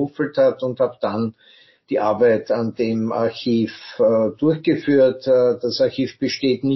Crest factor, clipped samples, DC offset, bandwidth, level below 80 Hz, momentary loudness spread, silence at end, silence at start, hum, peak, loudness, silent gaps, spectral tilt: 14 dB; under 0.1%; under 0.1%; 6.2 kHz; -64 dBFS; 7 LU; 0 s; 0 s; none; -6 dBFS; -19 LUFS; none; -5 dB/octave